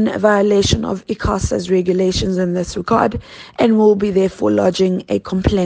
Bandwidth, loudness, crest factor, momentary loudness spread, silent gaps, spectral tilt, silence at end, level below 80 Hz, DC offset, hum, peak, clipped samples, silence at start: 9.6 kHz; -16 LUFS; 16 dB; 7 LU; none; -6 dB/octave; 0 s; -34 dBFS; under 0.1%; none; 0 dBFS; under 0.1%; 0 s